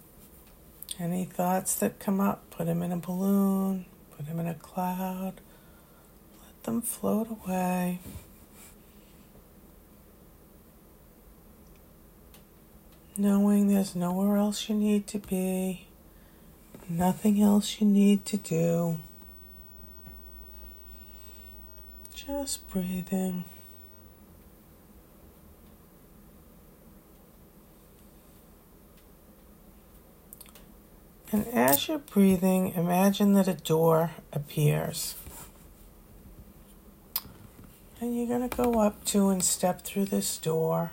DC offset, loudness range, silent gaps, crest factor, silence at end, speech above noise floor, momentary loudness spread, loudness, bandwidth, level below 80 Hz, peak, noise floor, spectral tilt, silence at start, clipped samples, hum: under 0.1%; 13 LU; none; 22 dB; 0 s; 28 dB; 23 LU; -28 LUFS; 16.5 kHz; -56 dBFS; -8 dBFS; -55 dBFS; -5.5 dB/octave; 0.9 s; under 0.1%; none